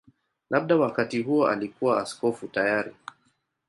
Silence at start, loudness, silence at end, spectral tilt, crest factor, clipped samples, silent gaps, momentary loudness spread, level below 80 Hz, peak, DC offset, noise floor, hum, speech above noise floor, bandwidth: 0.5 s; -25 LUFS; 0.8 s; -6 dB/octave; 18 dB; under 0.1%; none; 8 LU; -70 dBFS; -8 dBFS; under 0.1%; -71 dBFS; none; 46 dB; 11.5 kHz